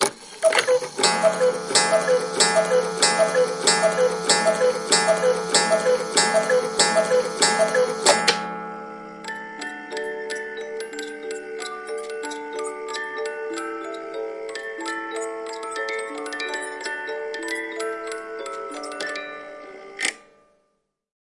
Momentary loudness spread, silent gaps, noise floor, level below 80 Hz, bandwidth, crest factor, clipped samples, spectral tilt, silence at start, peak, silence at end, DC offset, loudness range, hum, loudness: 14 LU; none; -72 dBFS; -68 dBFS; 11.5 kHz; 22 dB; under 0.1%; -1.5 dB/octave; 0 s; -2 dBFS; 1.05 s; under 0.1%; 12 LU; none; -22 LUFS